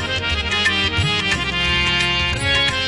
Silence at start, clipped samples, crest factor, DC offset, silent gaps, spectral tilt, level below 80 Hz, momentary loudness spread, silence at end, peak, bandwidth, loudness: 0 s; under 0.1%; 12 dB; under 0.1%; none; -3 dB/octave; -34 dBFS; 3 LU; 0 s; -6 dBFS; 11.5 kHz; -17 LUFS